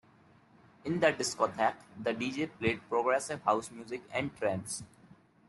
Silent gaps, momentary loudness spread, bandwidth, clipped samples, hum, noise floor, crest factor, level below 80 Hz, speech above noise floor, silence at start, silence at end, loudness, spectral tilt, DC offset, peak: none; 11 LU; 12 kHz; under 0.1%; none; -62 dBFS; 22 dB; -70 dBFS; 30 dB; 0.85 s; 0.65 s; -33 LUFS; -4 dB/octave; under 0.1%; -12 dBFS